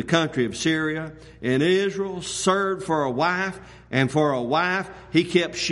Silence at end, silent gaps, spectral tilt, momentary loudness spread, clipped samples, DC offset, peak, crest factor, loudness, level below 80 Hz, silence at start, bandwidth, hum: 0 s; none; -4.5 dB/octave; 8 LU; under 0.1%; under 0.1%; -6 dBFS; 18 dB; -23 LUFS; -54 dBFS; 0 s; 11.5 kHz; none